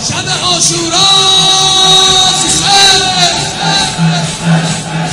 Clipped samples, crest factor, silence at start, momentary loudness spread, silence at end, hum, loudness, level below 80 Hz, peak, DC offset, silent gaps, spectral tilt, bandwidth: 0.6%; 10 dB; 0 s; 8 LU; 0 s; none; -7 LUFS; -36 dBFS; 0 dBFS; under 0.1%; none; -2 dB/octave; 12 kHz